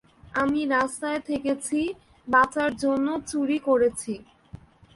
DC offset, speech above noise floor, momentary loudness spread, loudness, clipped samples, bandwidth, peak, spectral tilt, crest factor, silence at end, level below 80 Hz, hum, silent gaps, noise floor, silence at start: under 0.1%; 23 dB; 11 LU; -25 LUFS; under 0.1%; 11.5 kHz; -8 dBFS; -4 dB/octave; 18 dB; 0.4 s; -56 dBFS; none; none; -47 dBFS; 0.25 s